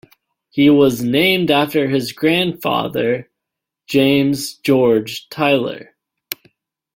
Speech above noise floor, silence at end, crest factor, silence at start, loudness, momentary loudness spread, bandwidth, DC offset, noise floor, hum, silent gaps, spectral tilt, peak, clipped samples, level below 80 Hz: 66 dB; 0.6 s; 16 dB; 0.55 s; -16 LUFS; 14 LU; 17 kHz; under 0.1%; -82 dBFS; none; none; -5.5 dB/octave; -2 dBFS; under 0.1%; -56 dBFS